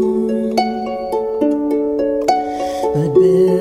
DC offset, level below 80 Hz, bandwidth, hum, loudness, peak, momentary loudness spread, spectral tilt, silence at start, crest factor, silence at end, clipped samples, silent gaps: under 0.1%; -46 dBFS; 13.5 kHz; none; -17 LUFS; 0 dBFS; 8 LU; -7 dB/octave; 0 s; 14 dB; 0 s; under 0.1%; none